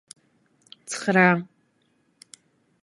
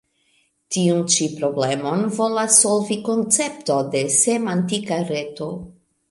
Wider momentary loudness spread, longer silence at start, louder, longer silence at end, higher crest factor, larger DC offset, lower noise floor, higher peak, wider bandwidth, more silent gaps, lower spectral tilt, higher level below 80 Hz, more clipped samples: first, 27 LU vs 13 LU; first, 0.9 s vs 0.7 s; about the same, -21 LUFS vs -19 LUFS; first, 1.4 s vs 0.4 s; about the same, 24 dB vs 20 dB; neither; about the same, -67 dBFS vs -64 dBFS; second, -4 dBFS vs 0 dBFS; about the same, 11.5 kHz vs 11.5 kHz; neither; first, -5.5 dB/octave vs -3.5 dB/octave; second, -72 dBFS vs -62 dBFS; neither